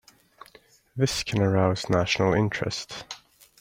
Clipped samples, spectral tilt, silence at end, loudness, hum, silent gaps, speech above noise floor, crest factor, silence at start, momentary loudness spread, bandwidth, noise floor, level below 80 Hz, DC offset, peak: under 0.1%; -5 dB/octave; 0.45 s; -25 LUFS; none; none; 32 dB; 18 dB; 0.95 s; 17 LU; 16 kHz; -56 dBFS; -54 dBFS; under 0.1%; -8 dBFS